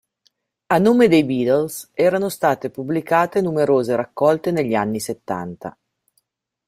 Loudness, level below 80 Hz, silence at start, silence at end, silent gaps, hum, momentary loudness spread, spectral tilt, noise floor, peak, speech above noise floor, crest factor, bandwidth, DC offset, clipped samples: -19 LUFS; -60 dBFS; 0.7 s; 0.95 s; none; none; 12 LU; -6 dB/octave; -69 dBFS; -2 dBFS; 50 dB; 18 dB; 16 kHz; under 0.1%; under 0.1%